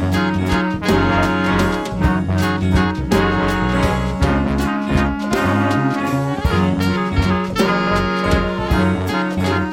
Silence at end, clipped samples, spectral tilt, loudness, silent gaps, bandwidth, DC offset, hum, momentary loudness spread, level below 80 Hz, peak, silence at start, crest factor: 0 s; under 0.1%; -6.5 dB/octave; -17 LUFS; none; 17 kHz; 0.1%; none; 3 LU; -28 dBFS; -2 dBFS; 0 s; 14 dB